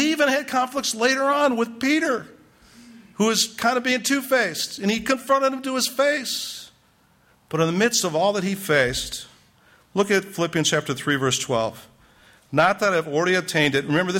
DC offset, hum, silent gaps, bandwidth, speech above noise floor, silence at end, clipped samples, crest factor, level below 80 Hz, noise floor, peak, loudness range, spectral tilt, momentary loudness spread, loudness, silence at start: under 0.1%; none; none; 16.5 kHz; 38 dB; 0 s; under 0.1%; 16 dB; -56 dBFS; -59 dBFS; -6 dBFS; 2 LU; -3.5 dB/octave; 7 LU; -22 LUFS; 0 s